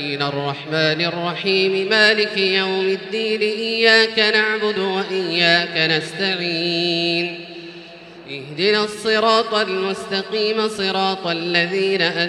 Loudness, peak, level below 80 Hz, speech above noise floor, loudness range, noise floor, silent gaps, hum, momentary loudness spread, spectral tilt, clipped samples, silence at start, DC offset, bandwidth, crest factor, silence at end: -18 LUFS; 0 dBFS; -66 dBFS; 20 dB; 4 LU; -39 dBFS; none; none; 9 LU; -4 dB/octave; under 0.1%; 0 s; under 0.1%; 12 kHz; 20 dB; 0 s